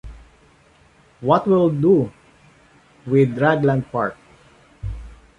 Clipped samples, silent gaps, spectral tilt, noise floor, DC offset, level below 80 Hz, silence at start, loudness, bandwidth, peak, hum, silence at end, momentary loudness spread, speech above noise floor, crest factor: under 0.1%; none; -9 dB/octave; -54 dBFS; under 0.1%; -42 dBFS; 0.05 s; -19 LUFS; 9.4 kHz; -2 dBFS; none; 0.25 s; 17 LU; 37 dB; 18 dB